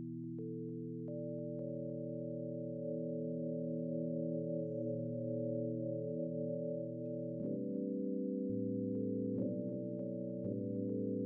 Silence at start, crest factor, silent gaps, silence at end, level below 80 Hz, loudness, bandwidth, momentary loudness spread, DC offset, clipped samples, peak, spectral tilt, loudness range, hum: 0 s; 12 dB; none; 0 s; -82 dBFS; -41 LUFS; 1.2 kHz; 4 LU; under 0.1%; under 0.1%; -28 dBFS; -17 dB/octave; 2 LU; none